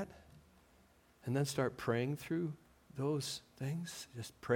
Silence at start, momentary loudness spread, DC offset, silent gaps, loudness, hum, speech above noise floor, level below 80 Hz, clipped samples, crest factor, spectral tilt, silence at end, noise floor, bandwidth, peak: 0 s; 13 LU; under 0.1%; none; -40 LUFS; none; 29 dB; -70 dBFS; under 0.1%; 20 dB; -5.5 dB/octave; 0 s; -68 dBFS; 17.5 kHz; -20 dBFS